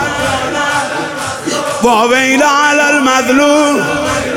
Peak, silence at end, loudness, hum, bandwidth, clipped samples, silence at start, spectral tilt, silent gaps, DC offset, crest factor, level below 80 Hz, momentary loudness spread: 0 dBFS; 0 s; -11 LUFS; none; 17 kHz; under 0.1%; 0 s; -3 dB/octave; none; under 0.1%; 12 dB; -42 dBFS; 8 LU